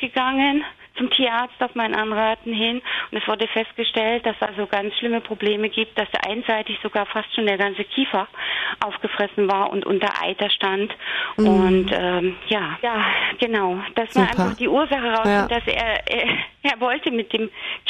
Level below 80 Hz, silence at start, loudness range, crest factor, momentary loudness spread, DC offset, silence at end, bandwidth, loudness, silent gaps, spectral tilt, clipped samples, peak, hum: -48 dBFS; 0 s; 3 LU; 18 dB; 6 LU; under 0.1%; 0 s; 10 kHz; -21 LUFS; none; -5.5 dB/octave; under 0.1%; -2 dBFS; none